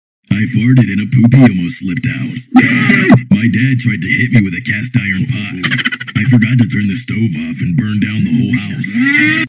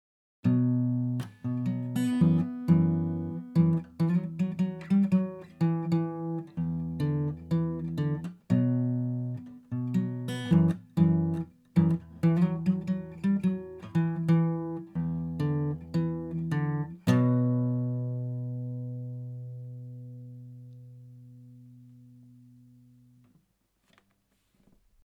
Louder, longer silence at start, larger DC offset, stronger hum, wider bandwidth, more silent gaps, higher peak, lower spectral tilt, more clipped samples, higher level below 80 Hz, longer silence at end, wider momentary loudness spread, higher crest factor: first, -12 LUFS vs -29 LUFS; second, 0.3 s vs 0.45 s; neither; neither; second, 4 kHz vs 8.6 kHz; neither; first, 0 dBFS vs -10 dBFS; about the same, -10 dB/octave vs -9 dB/octave; neither; first, -40 dBFS vs -64 dBFS; second, 0 s vs 3.2 s; second, 9 LU vs 13 LU; second, 12 dB vs 18 dB